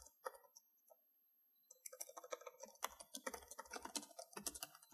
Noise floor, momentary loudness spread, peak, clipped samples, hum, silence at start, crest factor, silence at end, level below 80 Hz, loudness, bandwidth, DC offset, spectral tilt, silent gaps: -78 dBFS; 12 LU; -26 dBFS; under 0.1%; none; 0 s; 30 dB; 0 s; -80 dBFS; -52 LUFS; 15.5 kHz; under 0.1%; -0.5 dB/octave; none